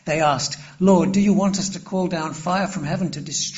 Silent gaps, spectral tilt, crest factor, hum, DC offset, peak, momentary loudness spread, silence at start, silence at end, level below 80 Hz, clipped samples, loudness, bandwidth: none; -5.5 dB/octave; 16 dB; none; under 0.1%; -4 dBFS; 8 LU; 0.05 s; 0 s; -52 dBFS; under 0.1%; -21 LUFS; 8 kHz